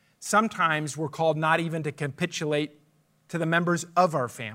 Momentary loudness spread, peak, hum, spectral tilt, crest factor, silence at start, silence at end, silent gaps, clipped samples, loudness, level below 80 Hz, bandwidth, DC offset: 8 LU; -8 dBFS; none; -5 dB/octave; 20 dB; 0.2 s; 0 s; none; under 0.1%; -26 LUFS; -74 dBFS; 16 kHz; under 0.1%